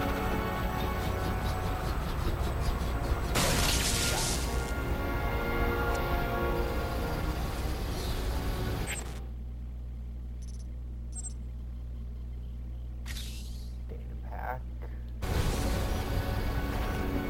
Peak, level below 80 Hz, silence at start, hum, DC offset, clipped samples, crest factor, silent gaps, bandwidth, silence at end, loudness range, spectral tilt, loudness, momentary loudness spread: -14 dBFS; -36 dBFS; 0 s; 60 Hz at -40 dBFS; under 0.1%; under 0.1%; 18 dB; none; 16.5 kHz; 0 s; 11 LU; -4.5 dB/octave; -33 LUFS; 13 LU